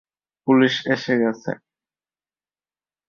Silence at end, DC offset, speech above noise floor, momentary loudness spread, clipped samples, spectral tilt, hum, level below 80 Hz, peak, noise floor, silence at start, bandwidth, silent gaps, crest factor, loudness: 1.5 s; under 0.1%; over 71 dB; 14 LU; under 0.1%; -6 dB/octave; 50 Hz at -60 dBFS; -66 dBFS; -4 dBFS; under -90 dBFS; 0.45 s; 7 kHz; none; 20 dB; -20 LUFS